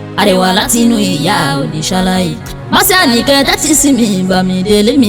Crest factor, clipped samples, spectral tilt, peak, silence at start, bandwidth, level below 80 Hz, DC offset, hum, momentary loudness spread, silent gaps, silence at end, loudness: 10 dB; under 0.1%; -3.5 dB/octave; 0 dBFS; 0 s; over 20 kHz; -34 dBFS; under 0.1%; none; 6 LU; none; 0 s; -10 LUFS